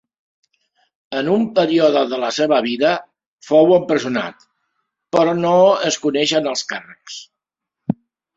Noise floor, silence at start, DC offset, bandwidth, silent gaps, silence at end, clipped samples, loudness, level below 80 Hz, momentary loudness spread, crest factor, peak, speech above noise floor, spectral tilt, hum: -82 dBFS; 1.1 s; under 0.1%; 7.8 kHz; 3.26-3.37 s; 0.45 s; under 0.1%; -17 LUFS; -62 dBFS; 17 LU; 16 dB; -2 dBFS; 66 dB; -4.5 dB/octave; none